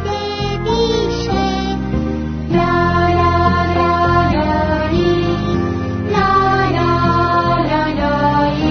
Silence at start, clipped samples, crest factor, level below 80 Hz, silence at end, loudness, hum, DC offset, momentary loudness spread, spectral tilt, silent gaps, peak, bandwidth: 0 s; under 0.1%; 14 dB; -30 dBFS; 0 s; -15 LUFS; none; under 0.1%; 6 LU; -7 dB/octave; none; -2 dBFS; 6.6 kHz